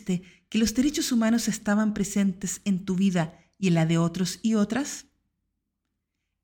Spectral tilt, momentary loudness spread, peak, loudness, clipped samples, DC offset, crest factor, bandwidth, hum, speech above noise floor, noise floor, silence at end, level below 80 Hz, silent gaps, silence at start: -5 dB/octave; 8 LU; -12 dBFS; -26 LUFS; under 0.1%; under 0.1%; 14 dB; 18 kHz; none; 56 dB; -81 dBFS; 1.45 s; -54 dBFS; none; 0.05 s